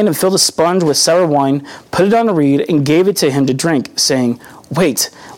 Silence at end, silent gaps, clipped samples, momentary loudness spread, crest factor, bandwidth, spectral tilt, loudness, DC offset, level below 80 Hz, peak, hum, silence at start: 0 s; none; under 0.1%; 7 LU; 12 dB; 19 kHz; -4 dB/octave; -13 LUFS; under 0.1%; -52 dBFS; -2 dBFS; none; 0 s